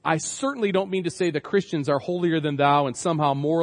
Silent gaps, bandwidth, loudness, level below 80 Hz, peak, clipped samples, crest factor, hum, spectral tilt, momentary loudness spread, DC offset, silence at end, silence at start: none; 10.5 kHz; -24 LUFS; -68 dBFS; -6 dBFS; under 0.1%; 18 dB; none; -5.5 dB/octave; 5 LU; under 0.1%; 0 s; 0.05 s